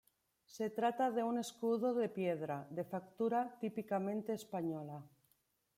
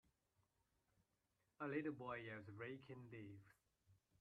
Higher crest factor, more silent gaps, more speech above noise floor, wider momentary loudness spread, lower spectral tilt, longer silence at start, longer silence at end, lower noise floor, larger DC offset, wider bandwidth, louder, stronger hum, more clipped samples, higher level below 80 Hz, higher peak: second, 16 dB vs 22 dB; neither; first, 41 dB vs 36 dB; second, 9 LU vs 12 LU; second, -6.5 dB/octave vs -8 dB/octave; second, 0.5 s vs 1.6 s; first, 0.7 s vs 0.25 s; second, -79 dBFS vs -88 dBFS; neither; first, 16 kHz vs 9 kHz; first, -39 LUFS vs -52 LUFS; neither; neither; about the same, -84 dBFS vs -86 dBFS; first, -24 dBFS vs -34 dBFS